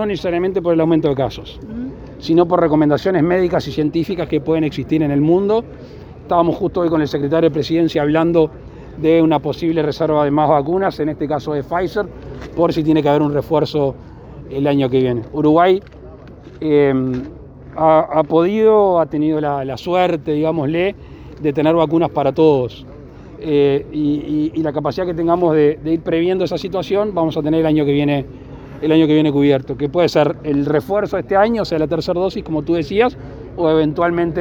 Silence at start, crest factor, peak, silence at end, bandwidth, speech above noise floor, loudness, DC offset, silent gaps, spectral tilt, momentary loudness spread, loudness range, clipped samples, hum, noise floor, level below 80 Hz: 0 s; 16 dB; 0 dBFS; 0 s; 7.4 kHz; 21 dB; -16 LUFS; under 0.1%; none; -8 dB/octave; 11 LU; 2 LU; under 0.1%; none; -37 dBFS; -42 dBFS